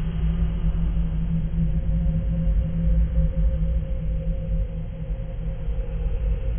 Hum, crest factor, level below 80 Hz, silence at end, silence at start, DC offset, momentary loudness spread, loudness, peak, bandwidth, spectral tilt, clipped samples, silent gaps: none; 12 dB; -24 dBFS; 0 s; 0 s; under 0.1%; 7 LU; -26 LUFS; -10 dBFS; 3.4 kHz; -13 dB/octave; under 0.1%; none